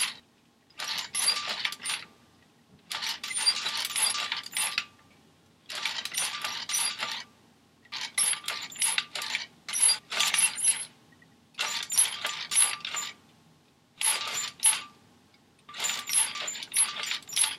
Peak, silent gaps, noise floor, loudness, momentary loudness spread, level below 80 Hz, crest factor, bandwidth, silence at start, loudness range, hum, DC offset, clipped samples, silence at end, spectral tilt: -8 dBFS; none; -63 dBFS; -27 LUFS; 12 LU; -80 dBFS; 24 dB; 16 kHz; 0 s; 5 LU; none; under 0.1%; under 0.1%; 0 s; 2.5 dB/octave